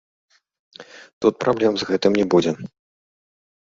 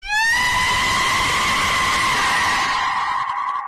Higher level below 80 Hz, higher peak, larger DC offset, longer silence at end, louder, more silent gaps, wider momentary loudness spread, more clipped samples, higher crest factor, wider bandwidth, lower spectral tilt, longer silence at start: second, -60 dBFS vs -40 dBFS; first, -2 dBFS vs -10 dBFS; neither; first, 0.95 s vs 0 s; second, -20 LUFS vs -17 LUFS; first, 1.13-1.21 s vs none; first, 15 LU vs 5 LU; neither; first, 20 dB vs 10 dB; second, 7.8 kHz vs 14 kHz; first, -6 dB/octave vs -1 dB/octave; first, 0.8 s vs 0.05 s